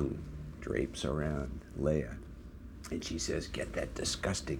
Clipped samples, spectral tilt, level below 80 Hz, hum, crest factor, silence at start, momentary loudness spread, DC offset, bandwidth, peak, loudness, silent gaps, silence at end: under 0.1%; -4.5 dB/octave; -46 dBFS; none; 20 dB; 0 s; 14 LU; under 0.1%; 18.5 kHz; -18 dBFS; -37 LUFS; none; 0 s